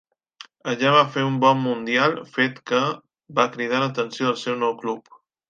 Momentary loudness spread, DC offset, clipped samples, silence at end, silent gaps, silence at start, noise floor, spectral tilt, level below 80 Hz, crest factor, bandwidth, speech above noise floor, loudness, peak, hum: 11 LU; under 0.1%; under 0.1%; 0.5 s; none; 0.65 s; -48 dBFS; -5 dB/octave; -72 dBFS; 20 dB; 9 kHz; 26 dB; -22 LUFS; -2 dBFS; none